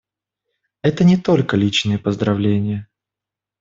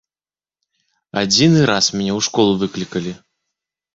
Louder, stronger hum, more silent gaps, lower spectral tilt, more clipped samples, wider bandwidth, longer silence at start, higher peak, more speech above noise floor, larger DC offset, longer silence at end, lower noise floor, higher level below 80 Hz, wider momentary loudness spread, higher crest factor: about the same, -17 LUFS vs -16 LUFS; neither; neither; first, -6.5 dB/octave vs -4 dB/octave; neither; about the same, 7.6 kHz vs 8 kHz; second, 0.85 s vs 1.15 s; about the same, -2 dBFS vs -2 dBFS; second, 70 dB vs over 74 dB; neither; about the same, 0.8 s vs 0.8 s; about the same, -87 dBFS vs under -90 dBFS; about the same, -52 dBFS vs -52 dBFS; second, 7 LU vs 13 LU; about the same, 16 dB vs 18 dB